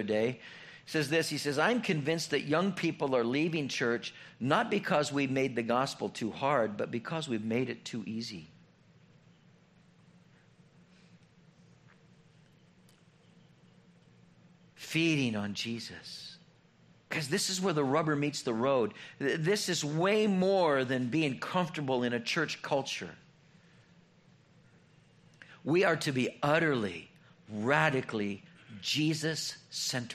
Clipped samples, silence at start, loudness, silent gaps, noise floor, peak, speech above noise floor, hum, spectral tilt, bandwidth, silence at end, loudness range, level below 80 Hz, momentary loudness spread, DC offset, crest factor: under 0.1%; 0 s; -31 LUFS; none; -63 dBFS; -10 dBFS; 32 dB; none; -4.5 dB/octave; 14 kHz; 0 s; 8 LU; -74 dBFS; 12 LU; under 0.1%; 22 dB